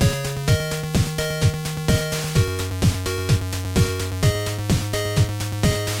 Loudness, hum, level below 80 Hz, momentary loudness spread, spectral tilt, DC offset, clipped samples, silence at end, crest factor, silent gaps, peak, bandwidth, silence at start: -22 LUFS; none; -34 dBFS; 2 LU; -5 dB/octave; under 0.1%; under 0.1%; 0 s; 16 dB; none; -6 dBFS; 17 kHz; 0 s